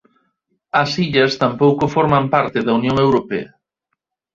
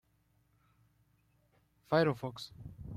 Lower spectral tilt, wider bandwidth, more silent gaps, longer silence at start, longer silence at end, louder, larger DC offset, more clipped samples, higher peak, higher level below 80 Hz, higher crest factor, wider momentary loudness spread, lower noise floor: about the same, -6.5 dB/octave vs -7 dB/octave; second, 7.6 kHz vs 15.5 kHz; neither; second, 0.75 s vs 1.9 s; first, 0.9 s vs 0 s; first, -16 LUFS vs -33 LUFS; neither; neither; first, -2 dBFS vs -16 dBFS; first, -50 dBFS vs -64 dBFS; second, 16 dB vs 22 dB; second, 5 LU vs 18 LU; about the same, -76 dBFS vs -73 dBFS